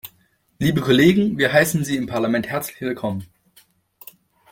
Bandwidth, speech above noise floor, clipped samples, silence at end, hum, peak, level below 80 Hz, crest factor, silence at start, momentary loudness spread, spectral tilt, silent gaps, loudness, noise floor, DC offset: 17 kHz; 43 dB; under 0.1%; 1.25 s; none; -2 dBFS; -52 dBFS; 18 dB; 0.05 s; 12 LU; -5.5 dB/octave; none; -19 LUFS; -62 dBFS; under 0.1%